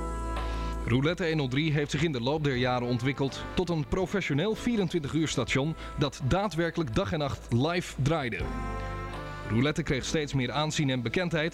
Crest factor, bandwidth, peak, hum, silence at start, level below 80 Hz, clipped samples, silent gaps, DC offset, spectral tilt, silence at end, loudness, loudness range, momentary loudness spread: 14 dB; 14 kHz; -14 dBFS; none; 0 s; -42 dBFS; under 0.1%; none; under 0.1%; -5.5 dB/octave; 0 s; -29 LUFS; 2 LU; 6 LU